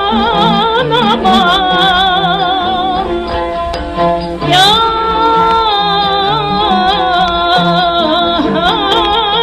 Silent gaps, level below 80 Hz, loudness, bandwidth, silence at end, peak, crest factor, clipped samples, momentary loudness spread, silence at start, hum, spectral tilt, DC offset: none; -30 dBFS; -10 LUFS; 16 kHz; 0 s; 0 dBFS; 10 dB; under 0.1%; 6 LU; 0 s; none; -4.5 dB/octave; under 0.1%